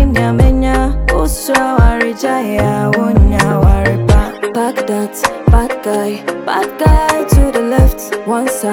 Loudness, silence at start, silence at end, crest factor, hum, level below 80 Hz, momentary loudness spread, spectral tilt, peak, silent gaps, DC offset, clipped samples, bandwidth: -13 LUFS; 0 s; 0 s; 12 dB; none; -16 dBFS; 6 LU; -6 dB/octave; 0 dBFS; none; under 0.1%; under 0.1%; 17 kHz